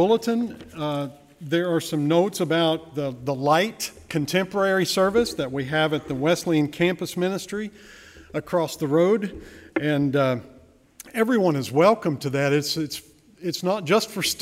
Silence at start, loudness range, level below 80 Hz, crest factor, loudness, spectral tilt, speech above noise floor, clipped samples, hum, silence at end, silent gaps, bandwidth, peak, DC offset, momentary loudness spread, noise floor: 0 s; 2 LU; -56 dBFS; 18 dB; -23 LUFS; -5 dB/octave; 29 dB; under 0.1%; none; 0 s; none; 16 kHz; -6 dBFS; under 0.1%; 11 LU; -52 dBFS